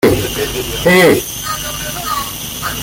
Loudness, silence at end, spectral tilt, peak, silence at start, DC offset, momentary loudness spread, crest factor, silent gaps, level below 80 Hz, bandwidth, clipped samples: -14 LUFS; 0 s; -3.5 dB/octave; 0 dBFS; 0 s; under 0.1%; 11 LU; 14 dB; none; -34 dBFS; 17 kHz; under 0.1%